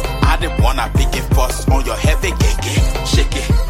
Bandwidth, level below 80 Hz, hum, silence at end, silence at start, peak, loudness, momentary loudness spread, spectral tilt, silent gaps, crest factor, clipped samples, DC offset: 16.5 kHz; -16 dBFS; none; 0 s; 0 s; 0 dBFS; -16 LUFS; 1 LU; -5 dB/octave; none; 14 dB; under 0.1%; under 0.1%